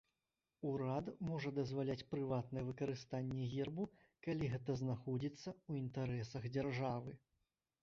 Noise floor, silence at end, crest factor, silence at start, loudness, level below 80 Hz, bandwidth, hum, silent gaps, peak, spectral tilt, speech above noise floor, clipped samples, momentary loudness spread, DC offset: under -90 dBFS; 0.65 s; 14 dB; 0.6 s; -44 LUFS; -68 dBFS; 7.4 kHz; none; none; -28 dBFS; -7 dB/octave; over 48 dB; under 0.1%; 6 LU; under 0.1%